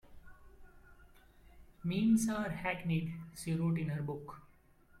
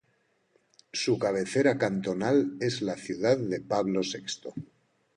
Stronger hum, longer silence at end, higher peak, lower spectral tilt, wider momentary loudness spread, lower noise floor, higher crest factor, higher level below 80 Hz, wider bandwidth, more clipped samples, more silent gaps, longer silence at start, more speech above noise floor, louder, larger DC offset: neither; about the same, 0.6 s vs 0.5 s; second, -20 dBFS vs -10 dBFS; first, -6.5 dB/octave vs -5 dB/octave; first, 14 LU vs 11 LU; second, -64 dBFS vs -71 dBFS; about the same, 18 dB vs 18 dB; first, -60 dBFS vs -68 dBFS; first, 14.5 kHz vs 11.5 kHz; neither; neither; second, 0.1 s vs 0.95 s; second, 29 dB vs 43 dB; second, -35 LUFS vs -28 LUFS; neither